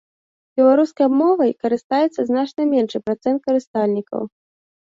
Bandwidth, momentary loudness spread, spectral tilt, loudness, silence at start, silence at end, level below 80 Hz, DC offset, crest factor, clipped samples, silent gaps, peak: 7.6 kHz; 9 LU; -7 dB/octave; -19 LUFS; 0.55 s; 0.7 s; -64 dBFS; under 0.1%; 14 dB; under 0.1%; 1.84-1.90 s, 3.67-3.74 s; -4 dBFS